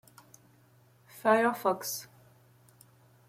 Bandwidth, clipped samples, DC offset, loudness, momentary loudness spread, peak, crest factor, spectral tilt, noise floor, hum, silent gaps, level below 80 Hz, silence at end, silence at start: 16.5 kHz; under 0.1%; under 0.1%; -29 LUFS; 12 LU; -12 dBFS; 22 dB; -3.5 dB/octave; -62 dBFS; none; none; -80 dBFS; 1.25 s; 1.15 s